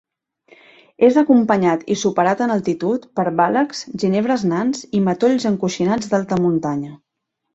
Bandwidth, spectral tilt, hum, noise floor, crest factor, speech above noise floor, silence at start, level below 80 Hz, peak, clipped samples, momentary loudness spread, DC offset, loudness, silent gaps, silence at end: 8 kHz; -6 dB/octave; none; -77 dBFS; 16 dB; 60 dB; 1 s; -58 dBFS; -2 dBFS; under 0.1%; 7 LU; under 0.1%; -18 LUFS; none; 0.6 s